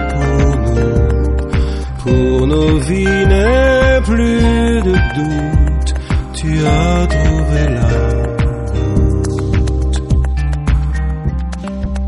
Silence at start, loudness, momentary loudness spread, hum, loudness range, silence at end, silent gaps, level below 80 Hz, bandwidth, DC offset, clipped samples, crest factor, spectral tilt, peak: 0 s; -14 LUFS; 7 LU; none; 4 LU; 0 s; none; -16 dBFS; 11 kHz; under 0.1%; under 0.1%; 12 dB; -7 dB/octave; -2 dBFS